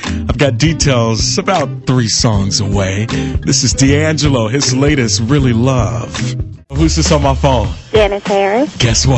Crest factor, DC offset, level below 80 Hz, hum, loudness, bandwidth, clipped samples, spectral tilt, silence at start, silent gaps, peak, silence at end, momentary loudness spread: 12 dB; under 0.1%; -24 dBFS; none; -13 LUFS; 8.4 kHz; under 0.1%; -4.5 dB/octave; 0 s; none; -2 dBFS; 0 s; 6 LU